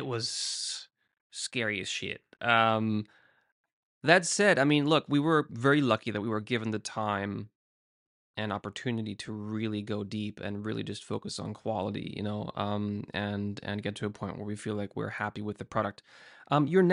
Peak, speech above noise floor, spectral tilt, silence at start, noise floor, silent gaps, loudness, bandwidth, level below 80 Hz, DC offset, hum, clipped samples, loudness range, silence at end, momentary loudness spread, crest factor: -8 dBFS; over 60 dB; -4.5 dB/octave; 0 s; under -90 dBFS; 1.20-1.30 s, 3.52-3.64 s, 3.73-4.01 s, 7.55-8.34 s; -30 LUFS; 11.5 kHz; -68 dBFS; under 0.1%; none; under 0.1%; 9 LU; 0 s; 13 LU; 24 dB